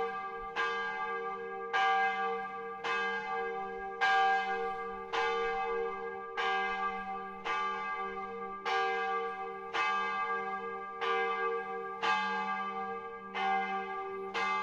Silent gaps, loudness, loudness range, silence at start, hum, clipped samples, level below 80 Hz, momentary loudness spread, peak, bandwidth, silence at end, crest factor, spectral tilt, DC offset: none; -34 LUFS; 3 LU; 0 s; none; under 0.1%; -66 dBFS; 10 LU; -16 dBFS; 8.6 kHz; 0 s; 18 dB; -3 dB/octave; under 0.1%